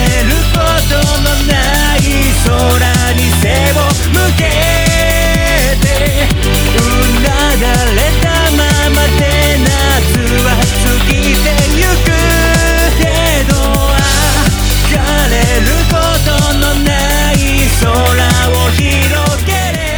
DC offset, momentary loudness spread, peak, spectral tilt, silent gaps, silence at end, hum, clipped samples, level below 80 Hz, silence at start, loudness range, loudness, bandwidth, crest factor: under 0.1%; 2 LU; 0 dBFS; -4 dB/octave; none; 0 s; none; under 0.1%; -14 dBFS; 0 s; 1 LU; -10 LUFS; over 20 kHz; 10 dB